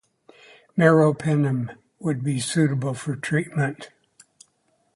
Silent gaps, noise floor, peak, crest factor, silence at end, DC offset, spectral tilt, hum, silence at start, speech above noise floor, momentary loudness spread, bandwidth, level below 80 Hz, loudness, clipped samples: none; -68 dBFS; -2 dBFS; 22 dB; 1.1 s; under 0.1%; -6.5 dB/octave; none; 0.75 s; 46 dB; 13 LU; 11.5 kHz; -64 dBFS; -23 LUFS; under 0.1%